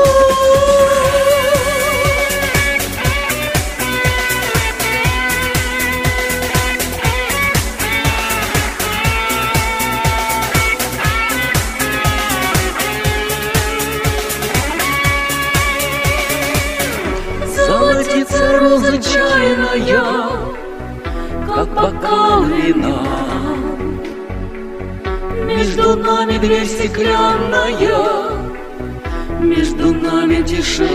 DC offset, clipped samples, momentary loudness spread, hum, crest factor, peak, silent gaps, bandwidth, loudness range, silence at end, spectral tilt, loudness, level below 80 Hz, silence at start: under 0.1%; under 0.1%; 10 LU; none; 14 dB; -2 dBFS; none; 16 kHz; 3 LU; 0 s; -4 dB/octave; -15 LUFS; -26 dBFS; 0 s